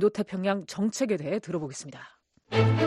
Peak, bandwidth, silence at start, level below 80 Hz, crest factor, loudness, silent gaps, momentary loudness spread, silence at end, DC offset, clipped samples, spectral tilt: -10 dBFS; 12.5 kHz; 0 s; -64 dBFS; 18 dB; -29 LUFS; none; 14 LU; 0 s; under 0.1%; under 0.1%; -6 dB/octave